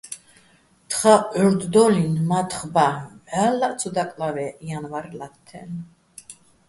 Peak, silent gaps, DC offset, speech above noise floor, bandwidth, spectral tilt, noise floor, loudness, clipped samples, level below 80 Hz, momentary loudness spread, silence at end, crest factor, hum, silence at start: -2 dBFS; none; under 0.1%; 36 dB; 12 kHz; -5.5 dB/octave; -57 dBFS; -21 LUFS; under 0.1%; -60 dBFS; 21 LU; 0.35 s; 20 dB; none; 0.05 s